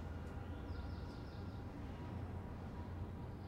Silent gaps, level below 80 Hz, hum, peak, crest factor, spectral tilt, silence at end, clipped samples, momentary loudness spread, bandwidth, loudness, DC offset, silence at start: none; -54 dBFS; none; -36 dBFS; 12 dB; -8 dB/octave; 0 s; under 0.1%; 2 LU; 12.5 kHz; -49 LUFS; under 0.1%; 0 s